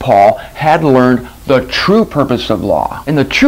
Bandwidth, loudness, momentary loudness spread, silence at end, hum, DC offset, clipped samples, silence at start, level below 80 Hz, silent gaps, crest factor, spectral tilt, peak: 16 kHz; -12 LUFS; 6 LU; 0 s; none; under 0.1%; under 0.1%; 0 s; -36 dBFS; none; 10 dB; -6 dB/octave; 0 dBFS